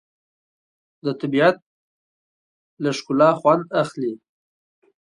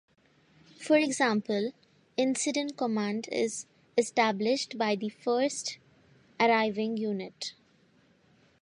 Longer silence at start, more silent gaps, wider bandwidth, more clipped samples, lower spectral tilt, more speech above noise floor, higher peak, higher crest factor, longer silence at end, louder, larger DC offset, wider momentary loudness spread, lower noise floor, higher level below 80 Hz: first, 1.05 s vs 0.8 s; first, 1.62-2.77 s vs none; about the same, 11 kHz vs 11.5 kHz; neither; first, -6 dB/octave vs -3.5 dB/octave; first, over 71 dB vs 36 dB; first, -4 dBFS vs -12 dBFS; about the same, 20 dB vs 20 dB; second, 0.9 s vs 1.1 s; first, -20 LUFS vs -29 LUFS; neither; about the same, 13 LU vs 12 LU; first, under -90 dBFS vs -65 dBFS; first, -72 dBFS vs -78 dBFS